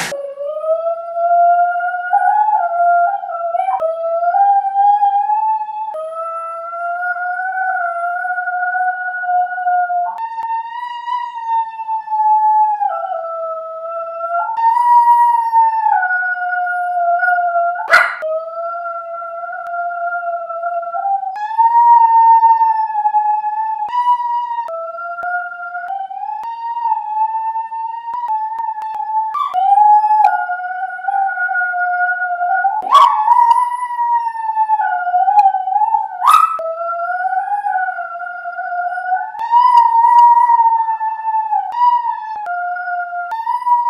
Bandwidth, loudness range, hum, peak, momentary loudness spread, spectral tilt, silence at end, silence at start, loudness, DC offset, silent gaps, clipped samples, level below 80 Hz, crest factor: 14 kHz; 8 LU; none; 0 dBFS; 14 LU; -1 dB/octave; 0 s; 0 s; -15 LUFS; under 0.1%; none; under 0.1%; -76 dBFS; 16 dB